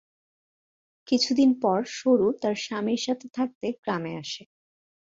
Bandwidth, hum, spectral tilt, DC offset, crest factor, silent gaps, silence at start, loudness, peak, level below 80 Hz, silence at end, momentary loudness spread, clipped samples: 7.8 kHz; none; -4.5 dB/octave; under 0.1%; 16 dB; 3.55-3.61 s, 3.78-3.83 s; 1.1 s; -26 LUFS; -10 dBFS; -70 dBFS; 0.7 s; 11 LU; under 0.1%